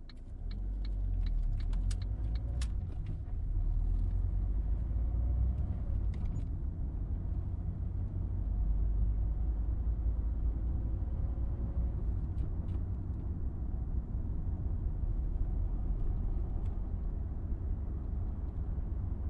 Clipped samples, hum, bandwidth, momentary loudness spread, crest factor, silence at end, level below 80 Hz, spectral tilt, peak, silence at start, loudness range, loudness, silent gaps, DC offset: under 0.1%; none; 5.8 kHz; 5 LU; 12 dB; 0 s; -34 dBFS; -8.5 dB/octave; -22 dBFS; 0 s; 2 LU; -37 LUFS; none; under 0.1%